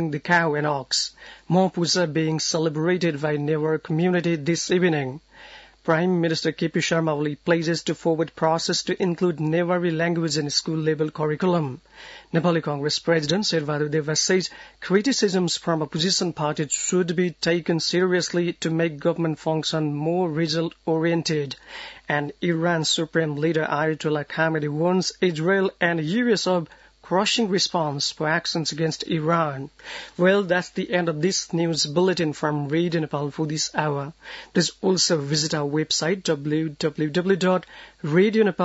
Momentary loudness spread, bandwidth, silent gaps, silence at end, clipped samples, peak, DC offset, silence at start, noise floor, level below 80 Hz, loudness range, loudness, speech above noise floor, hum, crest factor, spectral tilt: 6 LU; 8 kHz; none; 0 s; under 0.1%; -6 dBFS; under 0.1%; 0 s; -46 dBFS; -62 dBFS; 2 LU; -23 LUFS; 23 dB; none; 18 dB; -4.5 dB/octave